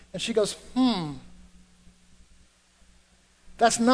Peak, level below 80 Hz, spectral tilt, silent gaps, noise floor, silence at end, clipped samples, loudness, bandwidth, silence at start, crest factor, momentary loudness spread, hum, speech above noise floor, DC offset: -6 dBFS; -54 dBFS; -3.5 dB/octave; none; -61 dBFS; 0 s; under 0.1%; -26 LUFS; 11 kHz; 0.15 s; 22 dB; 12 LU; none; 37 dB; under 0.1%